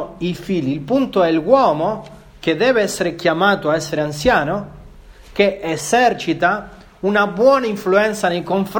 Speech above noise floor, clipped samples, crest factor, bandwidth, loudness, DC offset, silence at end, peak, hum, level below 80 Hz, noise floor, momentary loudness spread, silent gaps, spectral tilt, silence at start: 24 dB; under 0.1%; 18 dB; 19 kHz; -17 LUFS; under 0.1%; 0 s; 0 dBFS; none; -44 dBFS; -40 dBFS; 10 LU; none; -5 dB/octave; 0 s